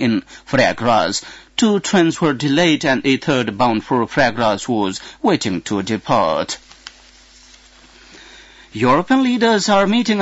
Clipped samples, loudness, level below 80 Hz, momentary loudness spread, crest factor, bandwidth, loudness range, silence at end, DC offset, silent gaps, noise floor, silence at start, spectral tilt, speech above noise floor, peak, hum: under 0.1%; -17 LUFS; -50 dBFS; 7 LU; 14 dB; 8 kHz; 5 LU; 0 s; under 0.1%; none; -46 dBFS; 0 s; -4.5 dB/octave; 30 dB; -2 dBFS; none